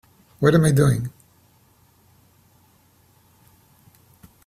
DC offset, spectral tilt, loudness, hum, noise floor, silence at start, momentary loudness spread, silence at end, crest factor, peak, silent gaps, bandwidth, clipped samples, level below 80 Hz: under 0.1%; -7 dB/octave; -19 LUFS; none; -58 dBFS; 0.4 s; 11 LU; 3.35 s; 22 dB; -2 dBFS; none; 15 kHz; under 0.1%; -52 dBFS